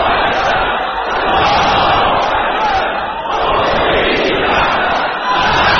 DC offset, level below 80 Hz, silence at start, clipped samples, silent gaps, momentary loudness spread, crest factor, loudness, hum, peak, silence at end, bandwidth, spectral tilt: under 0.1%; -32 dBFS; 0 s; under 0.1%; none; 5 LU; 14 dB; -13 LUFS; none; 0 dBFS; 0 s; 6.8 kHz; -1 dB/octave